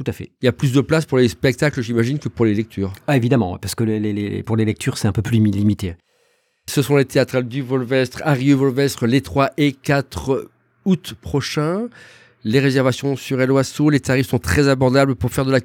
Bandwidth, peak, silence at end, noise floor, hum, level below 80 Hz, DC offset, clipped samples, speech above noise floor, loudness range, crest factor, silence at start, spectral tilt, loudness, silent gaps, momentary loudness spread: 17.5 kHz; -2 dBFS; 0 s; -63 dBFS; none; -44 dBFS; under 0.1%; under 0.1%; 45 dB; 3 LU; 16 dB; 0 s; -6.5 dB/octave; -19 LUFS; none; 7 LU